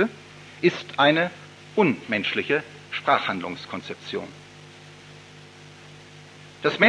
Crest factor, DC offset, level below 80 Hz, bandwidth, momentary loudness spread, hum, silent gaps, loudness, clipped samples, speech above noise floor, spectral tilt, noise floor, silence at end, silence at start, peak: 22 dB; under 0.1%; -70 dBFS; 11 kHz; 24 LU; 50 Hz at -55 dBFS; none; -24 LUFS; under 0.1%; 23 dB; -5.5 dB/octave; -46 dBFS; 0 s; 0 s; -4 dBFS